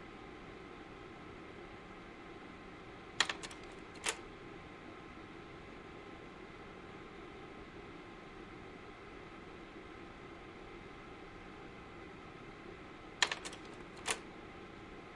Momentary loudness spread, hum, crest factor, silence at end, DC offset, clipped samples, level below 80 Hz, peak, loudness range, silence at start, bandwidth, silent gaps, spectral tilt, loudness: 15 LU; none; 34 dB; 0 s; under 0.1%; under 0.1%; -64 dBFS; -14 dBFS; 10 LU; 0 s; 11.5 kHz; none; -2 dB/octave; -46 LUFS